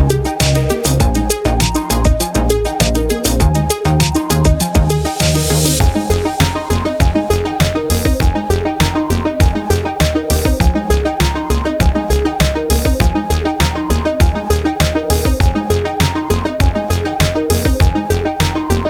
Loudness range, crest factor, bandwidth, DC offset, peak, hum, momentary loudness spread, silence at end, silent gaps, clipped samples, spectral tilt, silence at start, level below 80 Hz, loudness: 1 LU; 14 dB; 19.5 kHz; under 0.1%; 0 dBFS; none; 3 LU; 0 s; none; under 0.1%; -5 dB/octave; 0 s; -18 dBFS; -15 LUFS